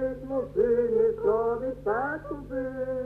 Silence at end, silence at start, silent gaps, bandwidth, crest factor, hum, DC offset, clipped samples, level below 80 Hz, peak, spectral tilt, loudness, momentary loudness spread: 0 s; 0 s; none; 3.9 kHz; 14 dB; 50 Hz at -55 dBFS; under 0.1%; under 0.1%; -50 dBFS; -14 dBFS; -9 dB/octave; -27 LUFS; 9 LU